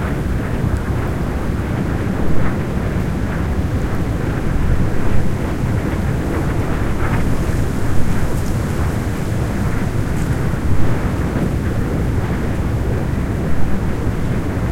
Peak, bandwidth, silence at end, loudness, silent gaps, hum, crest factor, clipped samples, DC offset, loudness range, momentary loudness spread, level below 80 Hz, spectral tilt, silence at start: 0 dBFS; 16 kHz; 0 s; -20 LUFS; none; none; 16 dB; under 0.1%; under 0.1%; 1 LU; 2 LU; -24 dBFS; -7.5 dB/octave; 0 s